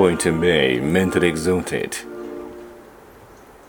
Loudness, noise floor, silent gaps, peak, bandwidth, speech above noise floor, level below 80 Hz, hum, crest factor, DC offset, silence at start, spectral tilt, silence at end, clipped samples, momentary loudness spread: -19 LUFS; -45 dBFS; none; -2 dBFS; over 20 kHz; 26 dB; -46 dBFS; none; 20 dB; under 0.1%; 0 s; -5 dB/octave; 0.85 s; under 0.1%; 19 LU